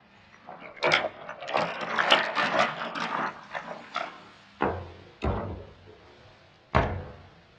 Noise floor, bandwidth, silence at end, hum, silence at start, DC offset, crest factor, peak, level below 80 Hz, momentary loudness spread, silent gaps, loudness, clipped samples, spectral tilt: -55 dBFS; 10.5 kHz; 0.3 s; none; 0.45 s; under 0.1%; 28 dB; -2 dBFS; -46 dBFS; 22 LU; none; -28 LUFS; under 0.1%; -4.5 dB/octave